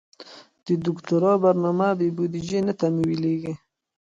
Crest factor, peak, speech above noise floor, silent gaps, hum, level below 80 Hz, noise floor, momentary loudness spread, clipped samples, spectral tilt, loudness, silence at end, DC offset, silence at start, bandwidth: 16 dB; -8 dBFS; 24 dB; none; none; -60 dBFS; -47 dBFS; 14 LU; under 0.1%; -8 dB/octave; -23 LUFS; 0.55 s; under 0.1%; 0.2 s; 7.8 kHz